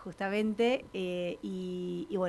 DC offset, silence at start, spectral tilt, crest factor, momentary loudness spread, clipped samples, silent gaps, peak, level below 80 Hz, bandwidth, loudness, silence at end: under 0.1%; 0 s; -6.5 dB/octave; 16 dB; 8 LU; under 0.1%; none; -16 dBFS; -64 dBFS; 12 kHz; -33 LUFS; 0 s